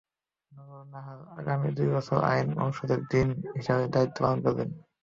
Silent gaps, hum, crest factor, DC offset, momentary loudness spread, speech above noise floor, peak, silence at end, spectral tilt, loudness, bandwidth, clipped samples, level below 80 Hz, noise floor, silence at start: none; none; 20 dB; under 0.1%; 18 LU; 35 dB; -10 dBFS; 0.25 s; -8 dB/octave; -28 LUFS; 7.4 kHz; under 0.1%; -54 dBFS; -63 dBFS; 0.5 s